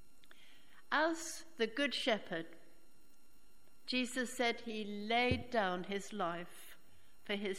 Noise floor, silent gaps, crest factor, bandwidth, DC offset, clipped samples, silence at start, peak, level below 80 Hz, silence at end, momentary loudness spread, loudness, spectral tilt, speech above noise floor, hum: -69 dBFS; none; 20 dB; 16 kHz; 0.3%; under 0.1%; 0.9 s; -18 dBFS; -66 dBFS; 0 s; 17 LU; -37 LUFS; -3.5 dB/octave; 31 dB; none